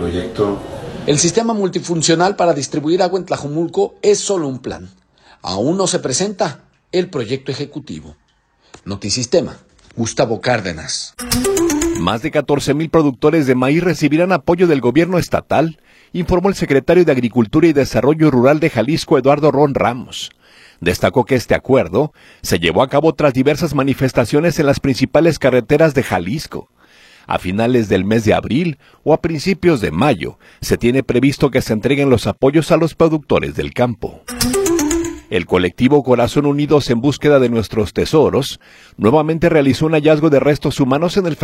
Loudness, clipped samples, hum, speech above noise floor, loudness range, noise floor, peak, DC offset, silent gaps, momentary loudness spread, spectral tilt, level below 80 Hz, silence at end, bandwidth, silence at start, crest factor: -15 LUFS; under 0.1%; none; 42 dB; 6 LU; -57 dBFS; 0 dBFS; under 0.1%; none; 10 LU; -5.5 dB/octave; -40 dBFS; 0 s; 16.5 kHz; 0 s; 16 dB